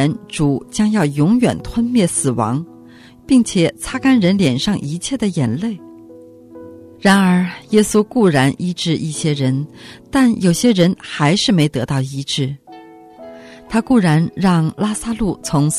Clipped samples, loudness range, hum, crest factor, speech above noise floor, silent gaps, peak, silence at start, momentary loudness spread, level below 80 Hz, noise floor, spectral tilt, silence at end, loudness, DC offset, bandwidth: under 0.1%; 3 LU; none; 14 dB; 26 dB; none; -2 dBFS; 0 s; 8 LU; -44 dBFS; -42 dBFS; -5.5 dB/octave; 0 s; -16 LUFS; under 0.1%; 13.5 kHz